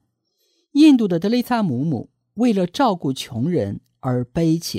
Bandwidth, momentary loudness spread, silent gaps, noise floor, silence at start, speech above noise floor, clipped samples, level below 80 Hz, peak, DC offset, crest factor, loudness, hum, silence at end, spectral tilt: 15.5 kHz; 12 LU; none; -69 dBFS; 0.75 s; 49 dB; under 0.1%; -54 dBFS; -4 dBFS; under 0.1%; 16 dB; -19 LUFS; none; 0 s; -6.5 dB/octave